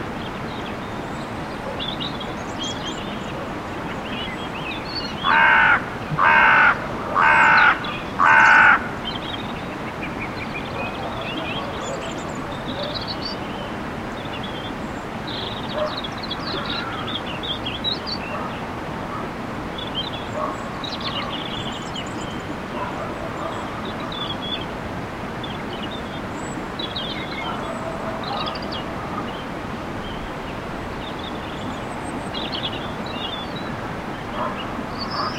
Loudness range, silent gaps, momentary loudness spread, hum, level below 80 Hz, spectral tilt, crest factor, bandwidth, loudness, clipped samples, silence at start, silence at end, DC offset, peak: 13 LU; none; 15 LU; none; -44 dBFS; -4.5 dB/octave; 22 dB; 16.5 kHz; -23 LUFS; under 0.1%; 0 s; 0 s; under 0.1%; -2 dBFS